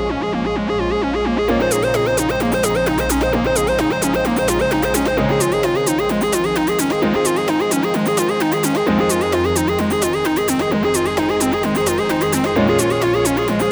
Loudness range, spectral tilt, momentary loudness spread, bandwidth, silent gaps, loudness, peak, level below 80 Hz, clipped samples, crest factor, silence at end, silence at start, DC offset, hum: 0 LU; -4.5 dB/octave; 2 LU; over 20 kHz; none; -17 LUFS; -4 dBFS; -34 dBFS; under 0.1%; 14 dB; 0 s; 0 s; under 0.1%; none